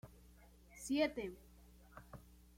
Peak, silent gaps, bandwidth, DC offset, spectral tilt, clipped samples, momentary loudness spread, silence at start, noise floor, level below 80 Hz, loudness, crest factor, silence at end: -24 dBFS; none; 16.5 kHz; under 0.1%; -4 dB/octave; under 0.1%; 25 LU; 0.05 s; -63 dBFS; -64 dBFS; -40 LUFS; 20 dB; 0.15 s